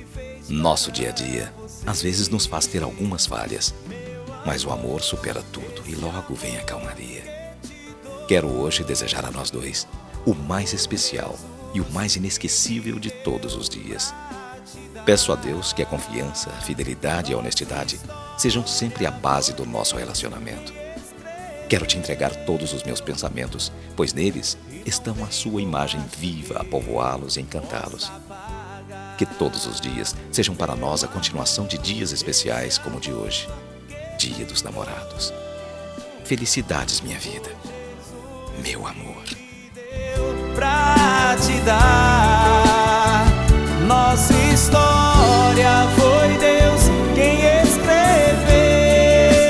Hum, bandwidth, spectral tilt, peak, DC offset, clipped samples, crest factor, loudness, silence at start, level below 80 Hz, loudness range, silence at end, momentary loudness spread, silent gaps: none; 11 kHz; -4 dB/octave; 0 dBFS; under 0.1%; under 0.1%; 20 dB; -20 LUFS; 0 s; -30 dBFS; 13 LU; 0 s; 21 LU; none